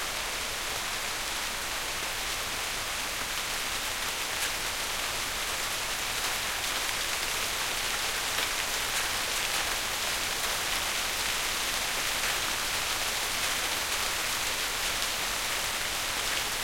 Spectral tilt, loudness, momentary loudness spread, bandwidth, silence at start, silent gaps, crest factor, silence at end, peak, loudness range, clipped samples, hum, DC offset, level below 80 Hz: 0 dB/octave; -29 LUFS; 3 LU; 16.5 kHz; 0 s; none; 20 dB; 0 s; -10 dBFS; 3 LU; under 0.1%; none; under 0.1%; -48 dBFS